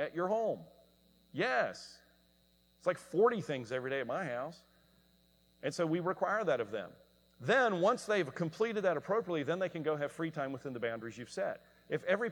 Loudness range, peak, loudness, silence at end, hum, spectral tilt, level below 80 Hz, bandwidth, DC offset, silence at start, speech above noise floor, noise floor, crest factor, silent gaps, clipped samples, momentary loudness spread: 4 LU; -16 dBFS; -35 LUFS; 0 s; none; -5.5 dB/octave; -76 dBFS; 19.5 kHz; under 0.1%; 0 s; 35 dB; -70 dBFS; 18 dB; none; under 0.1%; 12 LU